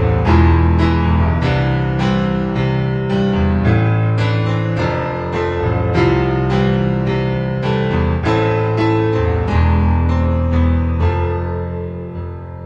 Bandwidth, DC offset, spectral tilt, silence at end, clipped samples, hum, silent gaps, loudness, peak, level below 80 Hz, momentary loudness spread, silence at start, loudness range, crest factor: 7.2 kHz; under 0.1%; -8.5 dB/octave; 0 s; under 0.1%; none; none; -16 LUFS; 0 dBFS; -24 dBFS; 6 LU; 0 s; 1 LU; 14 dB